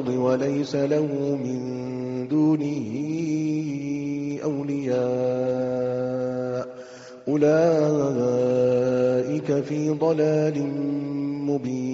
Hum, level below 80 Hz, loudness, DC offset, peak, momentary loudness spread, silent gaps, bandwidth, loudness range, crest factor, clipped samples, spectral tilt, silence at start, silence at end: none; -64 dBFS; -24 LUFS; under 0.1%; -10 dBFS; 8 LU; none; 7.8 kHz; 4 LU; 14 dB; under 0.1%; -8 dB/octave; 0 s; 0 s